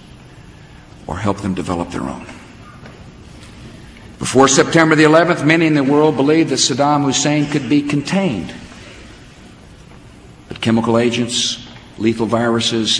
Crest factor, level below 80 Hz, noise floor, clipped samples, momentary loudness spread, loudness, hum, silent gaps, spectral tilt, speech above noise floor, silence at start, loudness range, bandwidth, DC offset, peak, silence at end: 16 dB; -46 dBFS; -40 dBFS; under 0.1%; 24 LU; -15 LUFS; none; none; -4 dB/octave; 26 dB; 0.15 s; 13 LU; 11 kHz; under 0.1%; 0 dBFS; 0 s